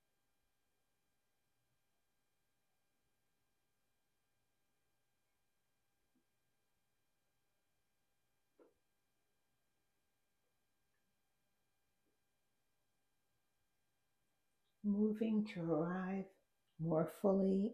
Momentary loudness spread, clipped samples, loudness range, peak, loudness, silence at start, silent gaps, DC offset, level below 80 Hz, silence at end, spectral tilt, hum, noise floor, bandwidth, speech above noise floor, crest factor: 10 LU; under 0.1%; 7 LU; -22 dBFS; -39 LUFS; 14.85 s; none; under 0.1%; -82 dBFS; 0 s; -9 dB/octave; none; -88 dBFS; 10 kHz; 50 dB; 24 dB